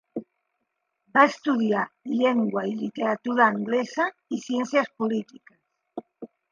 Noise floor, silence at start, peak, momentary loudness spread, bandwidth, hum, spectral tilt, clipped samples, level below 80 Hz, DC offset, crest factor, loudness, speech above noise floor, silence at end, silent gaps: -78 dBFS; 0.15 s; -4 dBFS; 20 LU; 7.4 kHz; none; -5.5 dB/octave; under 0.1%; -78 dBFS; under 0.1%; 22 dB; -24 LUFS; 54 dB; 0.25 s; none